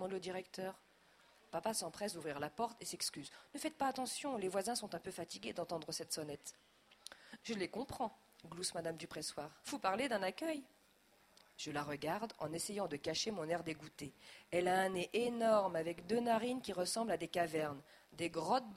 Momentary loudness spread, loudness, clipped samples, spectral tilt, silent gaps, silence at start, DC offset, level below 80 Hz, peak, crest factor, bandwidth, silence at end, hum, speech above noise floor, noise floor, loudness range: 15 LU; -41 LUFS; under 0.1%; -3.5 dB/octave; none; 0 s; under 0.1%; -74 dBFS; -20 dBFS; 20 dB; 16 kHz; 0 s; none; 30 dB; -71 dBFS; 8 LU